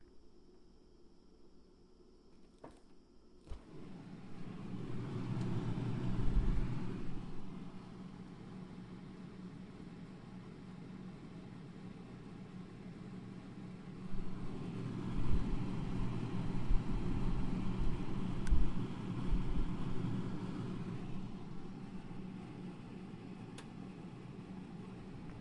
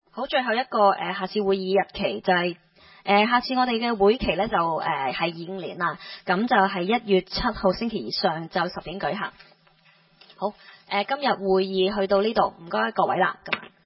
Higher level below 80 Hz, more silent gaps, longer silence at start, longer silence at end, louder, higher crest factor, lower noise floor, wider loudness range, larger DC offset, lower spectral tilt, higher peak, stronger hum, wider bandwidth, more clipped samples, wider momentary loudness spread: first, -44 dBFS vs -50 dBFS; neither; second, 0 s vs 0.15 s; second, 0 s vs 0.2 s; second, -44 LUFS vs -24 LUFS; about the same, 20 dB vs 20 dB; about the same, -62 dBFS vs -59 dBFS; first, 11 LU vs 5 LU; neither; about the same, -8 dB/octave vs -9 dB/octave; second, -18 dBFS vs -6 dBFS; neither; first, 9.8 kHz vs 5.8 kHz; neither; first, 12 LU vs 9 LU